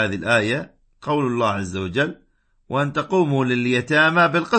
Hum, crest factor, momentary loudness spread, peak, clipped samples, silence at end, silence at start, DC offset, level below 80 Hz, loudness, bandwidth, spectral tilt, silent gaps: none; 16 dB; 10 LU; -4 dBFS; under 0.1%; 0 s; 0 s; under 0.1%; -56 dBFS; -20 LUFS; 8.8 kHz; -6 dB/octave; none